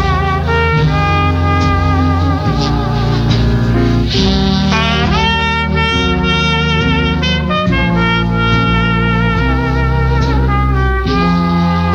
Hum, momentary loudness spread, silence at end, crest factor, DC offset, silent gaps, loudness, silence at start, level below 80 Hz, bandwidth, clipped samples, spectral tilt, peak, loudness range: none; 2 LU; 0 s; 10 dB; under 0.1%; none; -13 LUFS; 0 s; -20 dBFS; 7.6 kHz; under 0.1%; -6.5 dB/octave; -2 dBFS; 1 LU